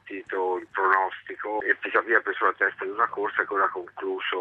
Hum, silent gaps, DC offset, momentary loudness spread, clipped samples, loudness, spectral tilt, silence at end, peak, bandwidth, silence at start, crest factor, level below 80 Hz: none; none; under 0.1%; 9 LU; under 0.1%; -25 LUFS; -5 dB/octave; 0 s; -4 dBFS; 5.6 kHz; 0.05 s; 22 dB; -74 dBFS